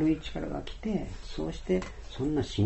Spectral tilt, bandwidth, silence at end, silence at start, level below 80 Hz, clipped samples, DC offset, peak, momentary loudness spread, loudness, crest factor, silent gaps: -7 dB/octave; 8.2 kHz; 0 s; 0 s; -42 dBFS; under 0.1%; under 0.1%; -16 dBFS; 7 LU; -34 LUFS; 16 dB; none